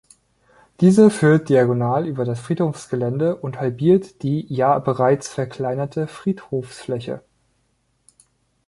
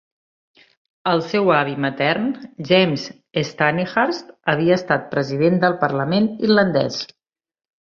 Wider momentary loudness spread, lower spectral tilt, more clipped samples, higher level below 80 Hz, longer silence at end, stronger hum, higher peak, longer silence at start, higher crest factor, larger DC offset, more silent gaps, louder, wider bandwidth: first, 14 LU vs 9 LU; first, -7.5 dB/octave vs -6 dB/octave; neither; about the same, -58 dBFS vs -60 dBFS; first, 1.5 s vs 0.9 s; neither; about the same, -2 dBFS vs -2 dBFS; second, 0.8 s vs 1.05 s; about the same, 18 dB vs 18 dB; neither; neither; about the same, -20 LUFS vs -19 LUFS; first, 11.5 kHz vs 7.2 kHz